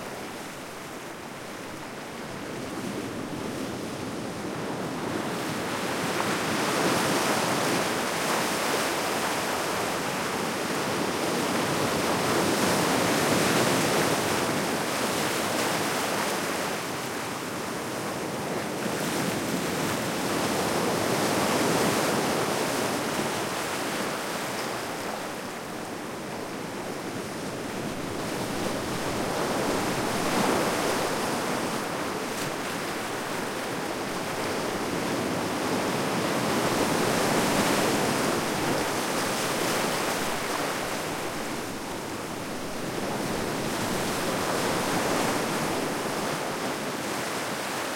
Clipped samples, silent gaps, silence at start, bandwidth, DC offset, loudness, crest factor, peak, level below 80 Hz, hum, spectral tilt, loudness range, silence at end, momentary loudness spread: under 0.1%; none; 0 s; 16.5 kHz; under 0.1%; -28 LUFS; 18 dB; -10 dBFS; -58 dBFS; none; -3.5 dB/octave; 8 LU; 0 s; 10 LU